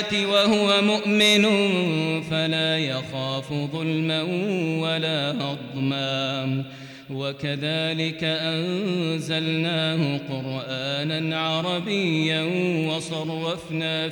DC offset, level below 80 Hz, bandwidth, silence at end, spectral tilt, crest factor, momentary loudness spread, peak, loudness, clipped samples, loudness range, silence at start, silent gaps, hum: under 0.1%; -64 dBFS; 19 kHz; 0 s; -5 dB/octave; 16 dB; 10 LU; -8 dBFS; -23 LUFS; under 0.1%; 5 LU; 0 s; none; none